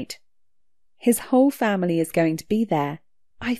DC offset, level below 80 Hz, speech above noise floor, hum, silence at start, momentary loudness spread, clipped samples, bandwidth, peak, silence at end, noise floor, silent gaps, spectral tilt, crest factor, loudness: 0.2%; -60 dBFS; 55 dB; none; 0 s; 15 LU; under 0.1%; 14 kHz; -6 dBFS; 0 s; -76 dBFS; none; -5.5 dB/octave; 16 dB; -22 LUFS